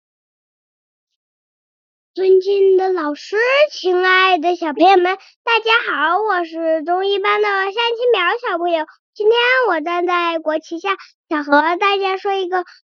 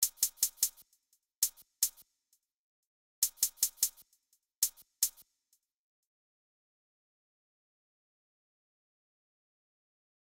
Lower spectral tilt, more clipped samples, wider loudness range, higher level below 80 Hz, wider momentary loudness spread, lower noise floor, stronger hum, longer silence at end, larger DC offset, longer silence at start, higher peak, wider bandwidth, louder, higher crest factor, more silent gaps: about the same, 2.5 dB/octave vs 3.5 dB/octave; neither; about the same, 3 LU vs 5 LU; about the same, -74 dBFS vs -74 dBFS; first, 9 LU vs 3 LU; first, under -90 dBFS vs -78 dBFS; neither; second, 0.25 s vs 5.1 s; neither; first, 2.15 s vs 0 s; first, -2 dBFS vs -12 dBFS; second, 7 kHz vs over 20 kHz; first, -16 LUFS vs -32 LUFS; second, 16 dB vs 28 dB; second, 5.36-5.45 s, 8.99-9.13 s, 11.14-11.24 s vs 1.37-1.42 s, 2.54-3.22 s, 4.57-4.62 s